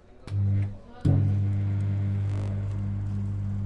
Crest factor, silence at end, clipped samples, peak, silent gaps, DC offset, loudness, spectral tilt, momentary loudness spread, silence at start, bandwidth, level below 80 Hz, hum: 16 dB; 0 s; under 0.1%; -12 dBFS; none; under 0.1%; -28 LUFS; -9.5 dB/octave; 7 LU; 0.2 s; 4.6 kHz; -44 dBFS; 50 Hz at -25 dBFS